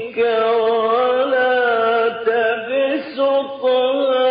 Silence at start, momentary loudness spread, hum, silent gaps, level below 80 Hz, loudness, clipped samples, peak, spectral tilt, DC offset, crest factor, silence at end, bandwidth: 0 s; 3 LU; none; none; -70 dBFS; -17 LUFS; under 0.1%; -6 dBFS; 0 dB/octave; under 0.1%; 12 dB; 0 s; 5 kHz